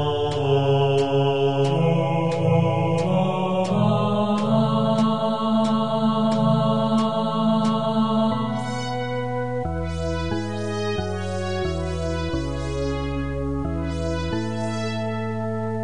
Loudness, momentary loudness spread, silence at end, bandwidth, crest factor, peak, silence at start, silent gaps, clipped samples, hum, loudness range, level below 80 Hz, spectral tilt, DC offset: -23 LUFS; 7 LU; 0 s; 10.5 kHz; 16 dB; -6 dBFS; 0 s; none; under 0.1%; none; 6 LU; -42 dBFS; -7 dB/octave; 1%